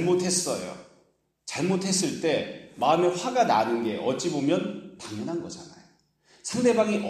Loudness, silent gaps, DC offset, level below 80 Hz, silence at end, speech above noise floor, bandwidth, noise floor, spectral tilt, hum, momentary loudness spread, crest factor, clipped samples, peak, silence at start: -26 LUFS; none; under 0.1%; -68 dBFS; 0 s; 41 dB; 15 kHz; -66 dBFS; -4 dB/octave; none; 16 LU; 18 dB; under 0.1%; -10 dBFS; 0 s